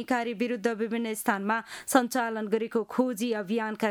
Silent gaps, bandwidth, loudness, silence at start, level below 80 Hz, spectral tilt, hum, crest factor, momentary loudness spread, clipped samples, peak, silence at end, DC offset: none; 19 kHz; -29 LUFS; 0 s; -74 dBFS; -4 dB/octave; none; 22 dB; 5 LU; under 0.1%; -6 dBFS; 0 s; under 0.1%